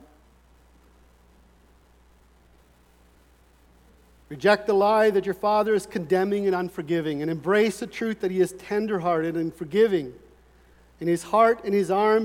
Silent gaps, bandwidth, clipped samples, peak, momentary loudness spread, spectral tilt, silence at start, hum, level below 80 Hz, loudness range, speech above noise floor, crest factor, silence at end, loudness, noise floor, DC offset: none; 16 kHz; under 0.1%; -6 dBFS; 8 LU; -6 dB/octave; 4.3 s; none; -58 dBFS; 3 LU; 34 dB; 20 dB; 0 s; -24 LUFS; -57 dBFS; under 0.1%